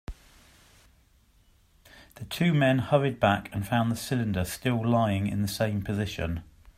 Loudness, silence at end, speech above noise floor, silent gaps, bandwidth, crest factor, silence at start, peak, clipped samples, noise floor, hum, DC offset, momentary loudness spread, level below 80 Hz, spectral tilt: -27 LUFS; 0.35 s; 36 dB; none; 16 kHz; 20 dB; 0.1 s; -8 dBFS; under 0.1%; -62 dBFS; none; under 0.1%; 10 LU; -50 dBFS; -6 dB/octave